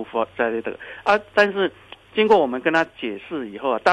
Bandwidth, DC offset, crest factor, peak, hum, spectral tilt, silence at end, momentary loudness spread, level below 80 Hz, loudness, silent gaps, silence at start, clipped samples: 10.5 kHz; under 0.1%; 18 dB; -4 dBFS; none; -5 dB/octave; 0 s; 12 LU; -60 dBFS; -21 LUFS; none; 0 s; under 0.1%